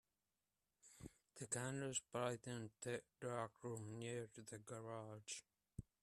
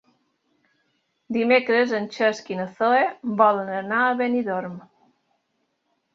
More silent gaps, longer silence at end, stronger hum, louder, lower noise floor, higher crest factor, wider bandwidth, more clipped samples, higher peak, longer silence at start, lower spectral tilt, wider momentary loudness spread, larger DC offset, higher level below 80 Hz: neither; second, 0.2 s vs 1.35 s; neither; second, -49 LUFS vs -22 LUFS; first, under -90 dBFS vs -73 dBFS; about the same, 22 dB vs 20 dB; first, 14.5 kHz vs 7.6 kHz; neither; second, -30 dBFS vs -4 dBFS; second, 0.85 s vs 1.3 s; second, -4 dB/octave vs -5.5 dB/octave; first, 15 LU vs 11 LU; neither; about the same, -78 dBFS vs -74 dBFS